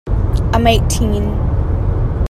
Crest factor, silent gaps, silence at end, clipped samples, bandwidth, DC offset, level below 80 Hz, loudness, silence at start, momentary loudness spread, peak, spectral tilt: 14 dB; none; 0 s; under 0.1%; 15 kHz; under 0.1%; -18 dBFS; -16 LUFS; 0.05 s; 5 LU; 0 dBFS; -6 dB/octave